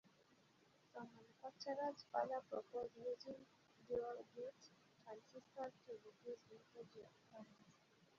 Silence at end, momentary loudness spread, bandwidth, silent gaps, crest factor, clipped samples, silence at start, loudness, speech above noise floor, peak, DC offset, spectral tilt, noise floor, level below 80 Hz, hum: 0.15 s; 18 LU; 7.2 kHz; none; 22 dB; under 0.1%; 0.05 s; -51 LUFS; 24 dB; -30 dBFS; under 0.1%; -3 dB/octave; -75 dBFS; -88 dBFS; none